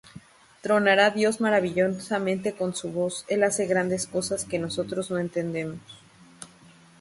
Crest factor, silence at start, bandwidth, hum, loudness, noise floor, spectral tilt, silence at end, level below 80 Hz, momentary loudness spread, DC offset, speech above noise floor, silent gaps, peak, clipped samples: 18 dB; 0.15 s; 12 kHz; none; -25 LUFS; -53 dBFS; -4 dB/octave; 0.55 s; -64 dBFS; 16 LU; under 0.1%; 28 dB; none; -8 dBFS; under 0.1%